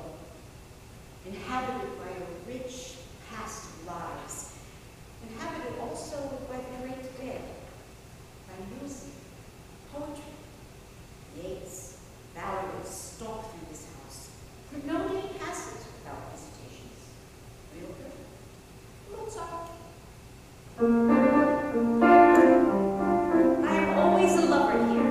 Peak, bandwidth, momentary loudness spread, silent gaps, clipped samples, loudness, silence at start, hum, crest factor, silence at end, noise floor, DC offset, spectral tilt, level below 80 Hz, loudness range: -6 dBFS; 15.5 kHz; 27 LU; none; under 0.1%; -26 LUFS; 0 s; none; 22 dB; 0 s; -49 dBFS; under 0.1%; -5.5 dB/octave; -54 dBFS; 22 LU